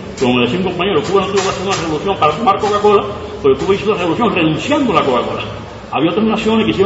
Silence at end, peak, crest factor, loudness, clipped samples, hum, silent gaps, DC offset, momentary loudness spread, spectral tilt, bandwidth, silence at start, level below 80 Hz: 0 s; 0 dBFS; 14 dB; -14 LUFS; under 0.1%; none; none; under 0.1%; 5 LU; -5.5 dB/octave; 8 kHz; 0 s; -40 dBFS